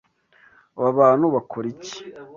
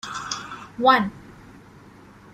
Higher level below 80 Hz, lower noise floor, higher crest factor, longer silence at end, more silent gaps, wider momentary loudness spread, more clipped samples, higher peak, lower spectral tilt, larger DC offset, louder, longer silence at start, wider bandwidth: second, -66 dBFS vs -58 dBFS; first, -57 dBFS vs -48 dBFS; about the same, 18 dB vs 22 dB; second, 0.15 s vs 0.45 s; neither; first, 19 LU vs 14 LU; neither; about the same, -4 dBFS vs -2 dBFS; first, -6.5 dB/octave vs -3.5 dB/octave; neither; about the same, -20 LUFS vs -22 LUFS; first, 0.75 s vs 0.05 s; second, 7.4 kHz vs 14 kHz